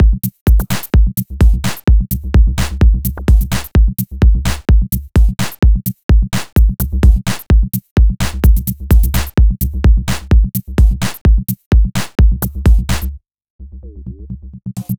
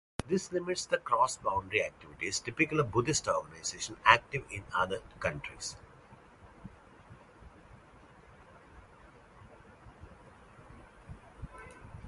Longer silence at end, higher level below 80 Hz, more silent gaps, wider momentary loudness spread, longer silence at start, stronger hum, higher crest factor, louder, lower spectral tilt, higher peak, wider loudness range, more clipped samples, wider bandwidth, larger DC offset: about the same, 0.05 s vs 0 s; first, -12 dBFS vs -58 dBFS; first, 0.41-0.46 s, 6.03-6.09 s, 7.91-7.96 s, 11.21-11.25 s, 11.66-11.71 s, 13.50-13.59 s vs none; second, 5 LU vs 25 LU; second, 0 s vs 0.2 s; neither; second, 12 dB vs 28 dB; first, -14 LUFS vs -32 LUFS; first, -6 dB/octave vs -3.5 dB/octave; first, 0 dBFS vs -6 dBFS; second, 2 LU vs 19 LU; neither; first, over 20 kHz vs 11.5 kHz; neither